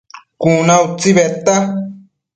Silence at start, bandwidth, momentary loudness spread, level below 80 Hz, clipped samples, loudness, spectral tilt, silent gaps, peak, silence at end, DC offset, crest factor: 0.15 s; 9.4 kHz; 10 LU; -54 dBFS; under 0.1%; -13 LUFS; -5 dB/octave; none; 0 dBFS; 0.35 s; under 0.1%; 14 dB